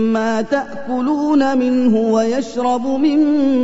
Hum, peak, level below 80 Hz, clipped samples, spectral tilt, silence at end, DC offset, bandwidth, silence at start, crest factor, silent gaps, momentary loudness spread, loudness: none; -4 dBFS; -52 dBFS; under 0.1%; -6 dB/octave; 0 s; 2%; 8 kHz; 0 s; 12 dB; none; 6 LU; -16 LUFS